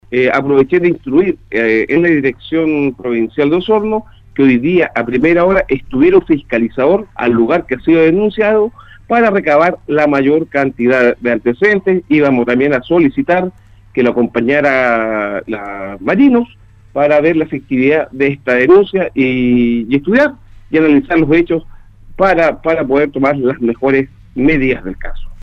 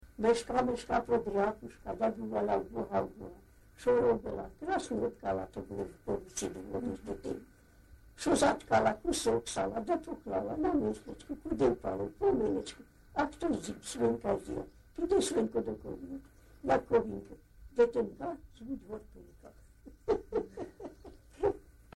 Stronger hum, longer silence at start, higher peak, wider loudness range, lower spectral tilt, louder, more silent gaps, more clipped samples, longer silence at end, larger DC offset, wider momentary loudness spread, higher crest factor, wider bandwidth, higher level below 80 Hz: neither; about the same, 0.1 s vs 0.05 s; first, 0 dBFS vs -16 dBFS; second, 2 LU vs 5 LU; first, -8 dB/octave vs -5 dB/octave; first, -12 LUFS vs -34 LUFS; neither; neither; second, 0.05 s vs 0.25 s; neither; second, 7 LU vs 15 LU; second, 12 dB vs 18 dB; second, 6.8 kHz vs 13 kHz; first, -36 dBFS vs -54 dBFS